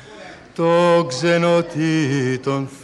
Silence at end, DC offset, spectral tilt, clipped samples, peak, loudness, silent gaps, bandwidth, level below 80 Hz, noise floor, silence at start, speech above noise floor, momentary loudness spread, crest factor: 0 s; under 0.1%; -6 dB/octave; under 0.1%; -6 dBFS; -18 LUFS; none; 11 kHz; -60 dBFS; -39 dBFS; 0.05 s; 22 dB; 15 LU; 14 dB